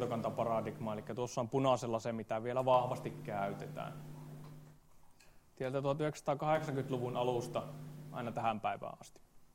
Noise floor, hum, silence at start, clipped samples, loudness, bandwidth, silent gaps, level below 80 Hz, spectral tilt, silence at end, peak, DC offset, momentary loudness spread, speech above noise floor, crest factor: -62 dBFS; none; 0 s; under 0.1%; -37 LUFS; 16 kHz; none; -68 dBFS; -6.5 dB/octave; 0.05 s; -16 dBFS; under 0.1%; 17 LU; 25 dB; 22 dB